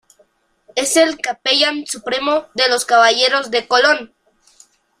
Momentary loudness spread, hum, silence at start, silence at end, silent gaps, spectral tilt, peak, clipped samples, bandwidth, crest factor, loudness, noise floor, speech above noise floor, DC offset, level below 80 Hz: 9 LU; none; 0.75 s; 0.95 s; none; 0 dB/octave; 0 dBFS; under 0.1%; 15.5 kHz; 16 dB; -15 LUFS; -58 dBFS; 42 dB; under 0.1%; -62 dBFS